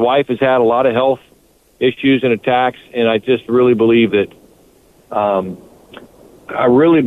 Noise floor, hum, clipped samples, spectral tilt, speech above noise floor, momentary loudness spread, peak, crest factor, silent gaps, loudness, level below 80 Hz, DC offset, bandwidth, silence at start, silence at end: -51 dBFS; none; under 0.1%; -7.5 dB/octave; 38 dB; 11 LU; -4 dBFS; 12 dB; none; -14 LUFS; -54 dBFS; under 0.1%; 4.1 kHz; 0 s; 0 s